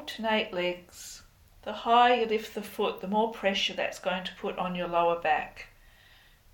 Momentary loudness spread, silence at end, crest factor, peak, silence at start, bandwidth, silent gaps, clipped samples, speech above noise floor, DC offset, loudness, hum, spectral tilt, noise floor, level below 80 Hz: 20 LU; 0.85 s; 20 dB; -10 dBFS; 0 s; 17.5 kHz; none; under 0.1%; 29 dB; under 0.1%; -28 LUFS; none; -4 dB/octave; -58 dBFS; -60 dBFS